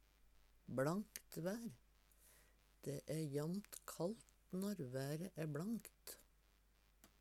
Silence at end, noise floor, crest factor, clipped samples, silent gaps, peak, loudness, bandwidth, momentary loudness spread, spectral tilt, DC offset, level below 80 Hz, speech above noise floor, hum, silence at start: 0.15 s; -74 dBFS; 24 dB; under 0.1%; none; -24 dBFS; -47 LUFS; 18 kHz; 13 LU; -6 dB/octave; under 0.1%; -74 dBFS; 28 dB; none; 0.65 s